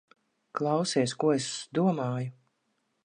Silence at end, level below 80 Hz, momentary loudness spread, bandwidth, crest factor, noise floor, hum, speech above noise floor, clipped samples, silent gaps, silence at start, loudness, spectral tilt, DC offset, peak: 0.75 s; -76 dBFS; 9 LU; 10.5 kHz; 18 dB; -76 dBFS; none; 48 dB; under 0.1%; none; 0.55 s; -29 LUFS; -5.5 dB/octave; under 0.1%; -12 dBFS